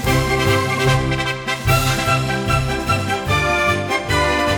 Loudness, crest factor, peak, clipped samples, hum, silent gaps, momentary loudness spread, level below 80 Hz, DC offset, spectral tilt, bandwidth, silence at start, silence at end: -18 LUFS; 14 dB; -4 dBFS; under 0.1%; none; none; 3 LU; -32 dBFS; under 0.1%; -4.5 dB/octave; 19.5 kHz; 0 s; 0 s